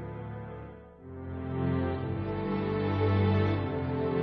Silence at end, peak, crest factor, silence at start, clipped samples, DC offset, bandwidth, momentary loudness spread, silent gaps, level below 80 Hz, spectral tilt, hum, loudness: 0 s; -16 dBFS; 14 dB; 0 s; under 0.1%; under 0.1%; 5.2 kHz; 17 LU; none; -50 dBFS; -10.5 dB/octave; none; -31 LUFS